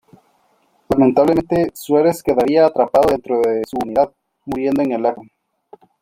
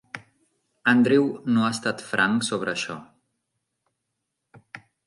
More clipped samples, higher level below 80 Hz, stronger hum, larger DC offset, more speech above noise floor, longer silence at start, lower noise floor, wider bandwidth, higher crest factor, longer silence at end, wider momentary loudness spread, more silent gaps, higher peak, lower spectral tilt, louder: neither; first, -50 dBFS vs -68 dBFS; neither; neither; second, 44 dB vs 58 dB; first, 0.9 s vs 0.15 s; second, -60 dBFS vs -80 dBFS; first, 16.5 kHz vs 11.5 kHz; about the same, 16 dB vs 20 dB; first, 0.8 s vs 0.3 s; second, 8 LU vs 22 LU; neither; first, -2 dBFS vs -6 dBFS; first, -7 dB/octave vs -4.5 dB/octave; first, -17 LUFS vs -23 LUFS